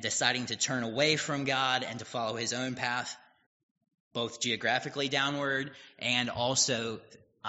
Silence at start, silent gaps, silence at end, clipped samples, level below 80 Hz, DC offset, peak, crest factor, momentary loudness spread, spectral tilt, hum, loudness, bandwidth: 0 s; 3.46-3.76 s, 4.00-4.11 s; 0 s; under 0.1%; -70 dBFS; under 0.1%; -8 dBFS; 24 dB; 9 LU; -1.5 dB/octave; none; -30 LUFS; 8 kHz